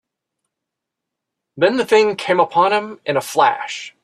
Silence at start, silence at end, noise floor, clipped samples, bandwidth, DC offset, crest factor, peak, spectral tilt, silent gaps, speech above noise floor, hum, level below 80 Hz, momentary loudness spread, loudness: 1.55 s; 0.15 s; -82 dBFS; under 0.1%; 14.5 kHz; under 0.1%; 18 dB; -2 dBFS; -4 dB/octave; none; 65 dB; none; -66 dBFS; 7 LU; -17 LUFS